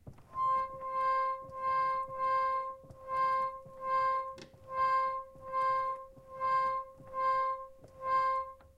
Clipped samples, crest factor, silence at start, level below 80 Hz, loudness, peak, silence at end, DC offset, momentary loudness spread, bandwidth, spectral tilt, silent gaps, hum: under 0.1%; 12 dB; 0.05 s; -64 dBFS; -33 LUFS; -22 dBFS; 0.15 s; under 0.1%; 12 LU; 8.4 kHz; -4.5 dB/octave; none; none